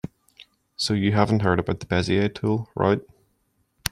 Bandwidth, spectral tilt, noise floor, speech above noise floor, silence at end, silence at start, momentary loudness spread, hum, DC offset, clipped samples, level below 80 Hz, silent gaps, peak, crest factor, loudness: 15.5 kHz; -6 dB/octave; -69 dBFS; 47 dB; 0.05 s; 0.8 s; 9 LU; none; under 0.1%; under 0.1%; -52 dBFS; none; -2 dBFS; 22 dB; -23 LUFS